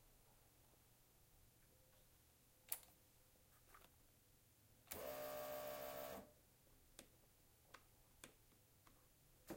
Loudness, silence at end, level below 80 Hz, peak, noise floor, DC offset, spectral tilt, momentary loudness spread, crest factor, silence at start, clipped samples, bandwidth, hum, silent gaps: -52 LUFS; 0 s; -78 dBFS; -26 dBFS; -74 dBFS; under 0.1%; -3 dB/octave; 18 LU; 34 dB; 0 s; under 0.1%; 16.5 kHz; none; none